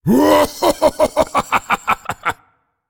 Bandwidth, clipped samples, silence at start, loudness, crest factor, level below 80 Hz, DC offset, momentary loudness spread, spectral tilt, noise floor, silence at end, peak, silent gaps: 19.5 kHz; under 0.1%; 0.05 s; -16 LUFS; 16 dB; -42 dBFS; under 0.1%; 11 LU; -4.5 dB/octave; -58 dBFS; 0.55 s; -2 dBFS; none